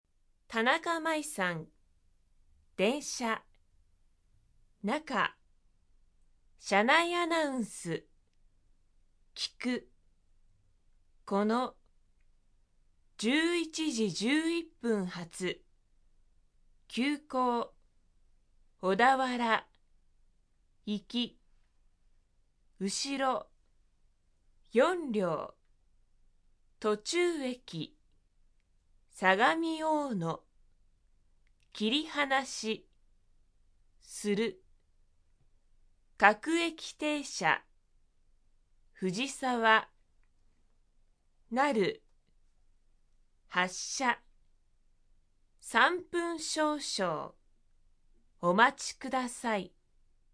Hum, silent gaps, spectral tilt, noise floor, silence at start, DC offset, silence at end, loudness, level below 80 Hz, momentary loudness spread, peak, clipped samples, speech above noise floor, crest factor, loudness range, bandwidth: none; none; -3.5 dB/octave; -69 dBFS; 0.5 s; under 0.1%; 0.65 s; -31 LUFS; -66 dBFS; 13 LU; -6 dBFS; under 0.1%; 38 dB; 28 dB; 6 LU; 11 kHz